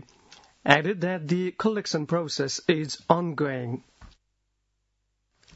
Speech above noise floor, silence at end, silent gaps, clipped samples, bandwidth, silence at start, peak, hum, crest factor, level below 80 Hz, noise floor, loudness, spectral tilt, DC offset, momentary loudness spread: 50 dB; 1.5 s; none; under 0.1%; 8 kHz; 0.65 s; 0 dBFS; 50 Hz at -50 dBFS; 28 dB; -64 dBFS; -76 dBFS; -26 LUFS; -5 dB/octave; under 0.1%; 10 LU